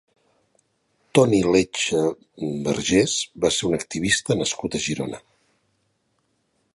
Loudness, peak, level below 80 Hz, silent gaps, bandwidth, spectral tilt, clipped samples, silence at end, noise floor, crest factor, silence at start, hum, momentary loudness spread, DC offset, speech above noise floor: -22 LUFS; -4 dBFS; -52 dBFS; none; 11.5 kHz; -4 dB/octave; under 0.1%; 1.55 s; -70 dBFS; 20 dB; 1.15 s; none; 11 LU; under 0.1%; 48 dB